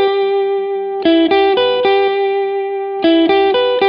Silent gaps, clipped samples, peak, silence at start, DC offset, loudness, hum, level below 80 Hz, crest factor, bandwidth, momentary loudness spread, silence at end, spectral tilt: none; under 0.1%; -2 dBFS; 0 s; under 0.1%; -14 LUFS; none; -52 dBFS; 12 dB; 5.4 kHz; 7 LU; 0 s; -6.5 dB/octave